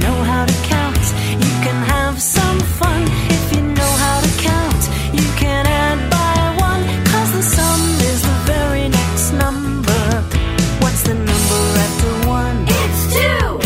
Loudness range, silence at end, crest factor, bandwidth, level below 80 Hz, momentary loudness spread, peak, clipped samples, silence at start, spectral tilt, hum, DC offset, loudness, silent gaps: 1 LU; 0 s; 14 dB; 16.5 kHz; -22 dBFS; 3 LU; 0 dBFS; under 0.1%; 0 s; -4.5 dB/octave; none; under 0.1%; -15 LUFS; none